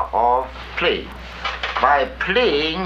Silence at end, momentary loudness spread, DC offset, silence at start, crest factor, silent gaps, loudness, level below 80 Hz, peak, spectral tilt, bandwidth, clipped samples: 0 s; 11 LU; under 0.1%; 0 s; 18 dB; none; -19 LUFS; -38 dBFS; -2 dBFS; -5 dB/octave; 8 kHz; under 0.1%